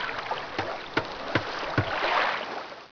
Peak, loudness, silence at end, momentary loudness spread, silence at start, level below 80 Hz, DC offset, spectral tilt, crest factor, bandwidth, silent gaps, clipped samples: -12 dBFS; -29 LUFS; 0.05 s; 8 LU; 0 s; -56 dBFS; 0.3%; -5 dB/octave; 18 dB; 5.4 kHz; none; under 0.1%